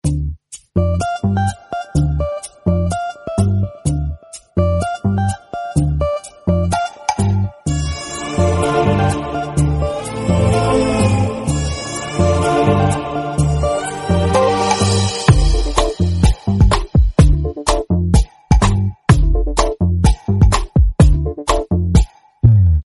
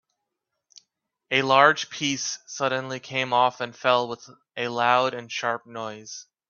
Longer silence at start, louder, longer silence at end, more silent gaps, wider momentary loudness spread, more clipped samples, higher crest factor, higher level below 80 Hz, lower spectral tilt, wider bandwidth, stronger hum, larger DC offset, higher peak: second, 0.05 s vs 1.3 s; first, -16 LUFS vs -23 LUFS; second, 0 s vs 0.25 s; neither; second, 8 LU vs 16 LU; neither; second, 14 dB vs 24 dB; first, -20 dBFS vs -72 dBFS; first, -6 dB/octave vs -3 dB/octave; first, 11.5 kHz vs 7.4 kHz; neither; neither; about the same, 0 dBFS vs -2 dBFS